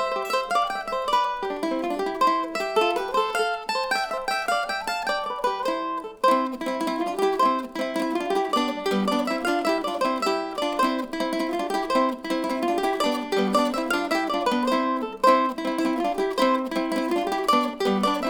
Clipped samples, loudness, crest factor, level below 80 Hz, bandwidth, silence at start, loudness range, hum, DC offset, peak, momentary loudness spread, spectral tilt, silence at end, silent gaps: under 0.1%; -24 LUFS; 20 dB; -56 dBFS; over 20 kHz; 0 s; 2 LU; none; under 0.1%; -6 dBFS; 5 LU; -4 dB/octave; 0 s; none